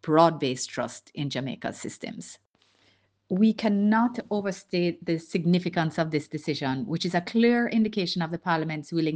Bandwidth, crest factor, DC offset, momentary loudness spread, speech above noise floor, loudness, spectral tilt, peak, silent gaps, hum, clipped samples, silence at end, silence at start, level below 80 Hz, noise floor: 9.6 kHz; 20 dB; under 0.1%; 12 LU; 40 dB; -26 LUFS; -6 dB/octave; -6 dBFS; 2.46-2.50 s; none; under 0.1%; 0 s; 0.05 s; -68 dBFS; -66 dBFS